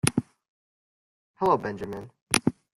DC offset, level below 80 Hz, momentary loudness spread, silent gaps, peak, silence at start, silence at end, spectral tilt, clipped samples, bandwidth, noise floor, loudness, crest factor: under 0.1%; -58 dBFS; 12 LU; 0.48-1.34 s, 2.22-2.27 s; 0 dBFS; 0.05 s; 0.3 s; -4 dB/octave; under 0.1%; 16 kHz; under -90 dBFS; -27 LUFS; 30 dB